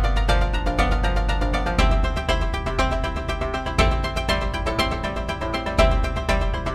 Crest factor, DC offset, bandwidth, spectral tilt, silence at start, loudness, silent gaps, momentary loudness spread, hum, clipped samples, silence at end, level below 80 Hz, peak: 18 dB; 0.2%; 12.5 kHz; -5.5 dB/octave; 0 s; -23 LUFS; none; 6 LU; none; under 0.1%; 0 s; -24 dBFS; -4 dBFS